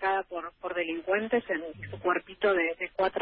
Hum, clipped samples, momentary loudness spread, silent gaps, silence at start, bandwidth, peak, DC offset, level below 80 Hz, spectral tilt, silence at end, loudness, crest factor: none; under 0.1%; 9 LU; none; 0 s; 5 kHz; -14 dBFS; under 0.1%; -62 dBFS; -8.5 dB/octave; 0 s; -30 LUFS; 16 dB